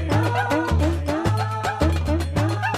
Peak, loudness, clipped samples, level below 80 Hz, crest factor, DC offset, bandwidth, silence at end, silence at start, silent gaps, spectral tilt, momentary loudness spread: -8 dBFS; -22 LUFS; under 0.1%; -30 dBFS; 14 dB; 0.2%; 15 kHz; 0 s; 0 s; none; -6.5 dB/octave; 2 LU